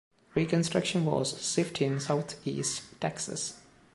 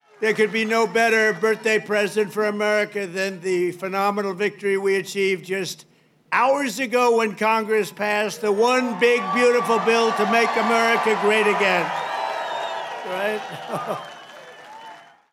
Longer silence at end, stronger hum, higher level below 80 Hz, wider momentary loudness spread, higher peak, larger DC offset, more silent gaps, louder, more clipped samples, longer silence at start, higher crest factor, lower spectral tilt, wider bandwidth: about the same, 0.35 s vs 0.3 s; neither; first, -66 dBFS vs -86 dBFS; second, 7 LU vs 11 LU; second, -12 dBFS vs -4 dBFS; neither; neither; second, -31 LUFS vs -21 LUFS; neither; first, 0.35 s vs 0.2 s; about the same, 18 dB vs 18 dB; about the same, -4.5 dB/octave vs -4 dB/octave; second, 11.5 kHz vs 16 kHz